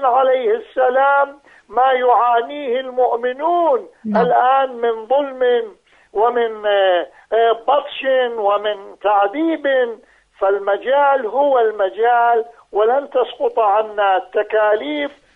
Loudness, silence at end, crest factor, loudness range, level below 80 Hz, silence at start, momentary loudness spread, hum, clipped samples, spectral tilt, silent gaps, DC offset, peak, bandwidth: -17 LUFS; 0.25 s; 14 dB; 1 LU; -64 dBFS; 0 s; 7 LU; none; under 0.1%; -6.5 dB/octave; none; under 0.1%; -2 dBFS; 4.6 kHz